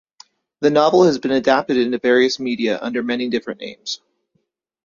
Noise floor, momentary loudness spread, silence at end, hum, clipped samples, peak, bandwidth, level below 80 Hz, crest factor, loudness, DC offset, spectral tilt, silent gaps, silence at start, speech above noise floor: -69 dBFS; 14 LU; 0.9 s; none; under 0.1%; -2 dBFS; 7.2 kHz; -60 dBFS; 18 dB; -18 LUFS; under 0.1%; -5 dB/octave; none; 0.6 s; 52 dB